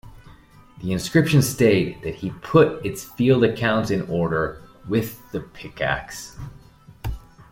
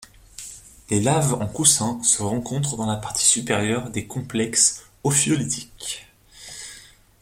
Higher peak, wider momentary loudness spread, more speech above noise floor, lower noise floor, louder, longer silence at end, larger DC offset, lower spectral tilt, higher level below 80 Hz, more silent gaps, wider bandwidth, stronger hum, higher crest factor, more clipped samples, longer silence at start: about the same, -2 dBFS vs -2 dBFS; about the same, 18 LU vs 19 LU; about the same, 27 dB vs 25 dB; about the same, -48 dBFS vs -47 dBFS; about the same, -21 LUFS vs -21 LUFS; second, 0.1 s vs 0.4 s; neither; first, -6 dB/octave vs -3 dB/octave; first, -44 dBFS vs -52 dBFS; neither; about the same, 16.5 kHz vs 16.5 kHz; neither; about the same, 20 dB vs 22 dB; neither; about the same, 0.05 s vs 0 s